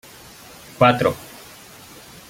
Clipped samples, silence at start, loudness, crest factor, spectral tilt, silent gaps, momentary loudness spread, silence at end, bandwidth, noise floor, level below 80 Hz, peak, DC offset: under 0.1%; 0.8 s; -18 LUFS; 22 dB; -5.5 dB/octave; none; 25 LU; 1.05 s; 17 kHz; -43 dBFS; -54 dBFS; -2 dBFS; under 0.1%